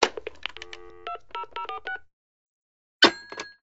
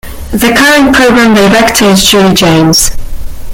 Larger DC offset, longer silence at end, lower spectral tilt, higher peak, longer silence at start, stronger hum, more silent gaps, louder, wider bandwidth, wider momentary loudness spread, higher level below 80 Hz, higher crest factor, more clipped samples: first, 0.4% vs under 0.1%; about the same, 0.05 s vs 0 s; second, 1 dB/octave vs -3.5 dB/octave; about the same, 0 dBFS vs 0 dBFS; about the same, 0 s vs 0.05 s; neither; first, 2.13-3.00 s vs none; second, -26 LUFS vs -5 LUFS; second, 8 kHz vs over 20 kHz; first, 20 LU vs 8 LU; second, -62 dBFS vs -22 dBFS; first, 30 dB vs 6 dB; second, under 0.1% vs 0.7%